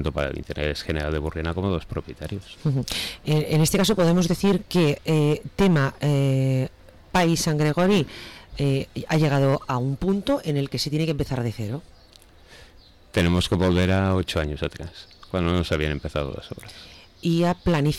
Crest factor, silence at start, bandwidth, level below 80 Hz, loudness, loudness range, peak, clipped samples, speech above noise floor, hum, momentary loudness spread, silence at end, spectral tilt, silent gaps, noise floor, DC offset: 10 dB; 0 s; 16 kHz; -40 dBFS; -23 LUFS; 6 LU; -12 dBFS; under 0.1%; 28 dB; none; 13 LU; 0 s; -6 dB/octave; none; -51 dBFS; under 0.1%